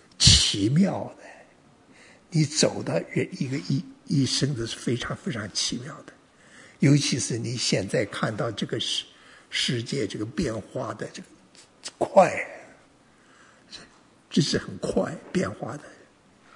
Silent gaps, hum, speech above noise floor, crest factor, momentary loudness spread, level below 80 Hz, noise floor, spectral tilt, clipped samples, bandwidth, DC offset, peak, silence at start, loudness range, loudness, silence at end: none; none; 31 dB; 26 dB; 18 LU; -46 dBFS; -57 dBFS; -4 dB/octave; under 0.1%; 11 kHz; under 0.1%; -2 dBFS; 0.2 s; 4 LU; -25 LUFS; 0.6 s